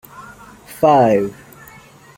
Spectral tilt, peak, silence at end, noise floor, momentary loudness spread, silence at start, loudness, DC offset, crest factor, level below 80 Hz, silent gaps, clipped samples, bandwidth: -7 dB/octave; -2 dBFS; 0.85 s; -43 dBFS; 26 LU; 0.2 s; -15 LUFS; under 0.1%; 16 dB; -54 dBFS; none; under 0.1%; 17 kHz